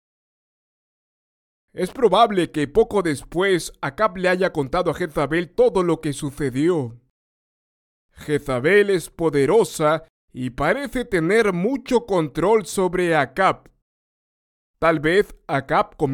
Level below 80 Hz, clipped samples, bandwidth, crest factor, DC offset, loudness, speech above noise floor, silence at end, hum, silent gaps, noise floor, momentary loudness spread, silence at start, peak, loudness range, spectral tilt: -46 dBFS; under 0.1%; 17 kHz; 18 dB; under 0.1%; -20 LUFS; over 70 dB; 0 s; none; 7.10-8.09 s, 10.10-10.28 s, 13.82-14.74 s; under -90 dBFS; 9 LU; 1.75 s; -4 dBFS; 3 LU; -5.5 dB/octave